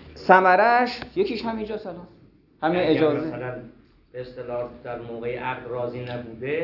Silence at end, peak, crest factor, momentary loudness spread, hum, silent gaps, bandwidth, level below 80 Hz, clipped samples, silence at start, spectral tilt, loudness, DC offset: 0 s; -2 dBFS; 24 dB; 20 LU; none; none; 6 kHz; -56 dBFS; under 0.1%; 0 s; -7.5 dB/octave; -23 LUFS; under 0.1%